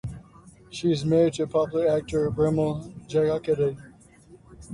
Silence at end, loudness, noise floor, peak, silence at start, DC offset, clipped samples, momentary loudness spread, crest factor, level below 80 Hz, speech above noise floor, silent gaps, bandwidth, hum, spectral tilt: 0 s; -25 LUFS; -52 dBFS; -10 dBFS; 0.05 s; under 0.1%; under 0.1%; 15 LU; 16 dB; -50 dBFS; 28 dB; none; 11 kHz; none; -7 dB/octave